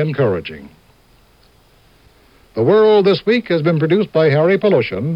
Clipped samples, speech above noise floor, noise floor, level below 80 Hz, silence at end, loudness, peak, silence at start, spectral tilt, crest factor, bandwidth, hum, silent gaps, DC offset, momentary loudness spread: under 0.1%; 37 dB; -51 dBFS; -54 dBFS; 0 s; -14 LUFS; -2 dBFS; 0 s; -8.5 dB/octave; 14 dB; 5.6 kHz; none; none; under 0.1%; 12 LU